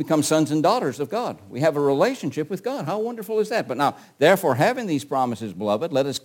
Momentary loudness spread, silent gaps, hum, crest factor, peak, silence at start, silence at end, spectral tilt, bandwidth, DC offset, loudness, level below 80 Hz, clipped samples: 9 LU; none; none; 18 dB; -4 dBFS; 0 s; 0.05 s; -5 dB/octave; 17 kHz; under 0.1%; -23 LUFS; -68 dBFS; under 0.1%